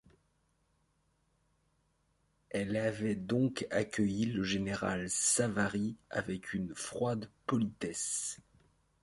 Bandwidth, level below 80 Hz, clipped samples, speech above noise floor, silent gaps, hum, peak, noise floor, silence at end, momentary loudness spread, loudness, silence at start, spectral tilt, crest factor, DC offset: 11.5 kHz; -64 dBFS; under 0.1%; 41 dB; none; none; -18 dBFS; -76 dBFS; 0.65 s; 9 LU; -34 LUFS; 2.5 s; -4 dB/octave; 18 dB; under 0.1%